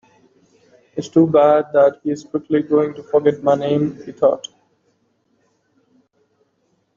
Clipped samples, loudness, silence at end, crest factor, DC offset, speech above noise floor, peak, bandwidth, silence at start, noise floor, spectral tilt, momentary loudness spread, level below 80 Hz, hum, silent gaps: under 0.1%; -17 LUFS; 2.6 s; 16 dB; under 0.1%; 49 dB; -2 dBFS; 7.4 kHz; 0.95 s; -65 dBFS; -7.5 dB/octave; 13 LU; -64 dBFS; none; none